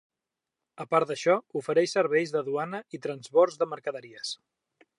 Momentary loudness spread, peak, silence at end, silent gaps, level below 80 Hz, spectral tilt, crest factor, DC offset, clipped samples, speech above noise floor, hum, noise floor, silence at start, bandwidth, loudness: 12 LU; -8 dBFS; 0.65 s; none; -84 dBFS; -4.5 dB/octave; 20 dB; under 0.1%; under 0.1%; 61 dB; none; -88 dBFS; 0.8 s; 11 kHz; -28 LUFS